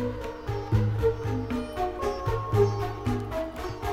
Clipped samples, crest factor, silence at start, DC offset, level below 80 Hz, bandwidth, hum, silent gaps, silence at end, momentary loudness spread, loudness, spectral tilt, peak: under 0.1%; 18 dB; 0 s; under 0.1%; -40 dBFS; 14 kHz; none; none; 0 s; 9 LU; -29 LUFS; -7.5 dB/octave; -10 dBFS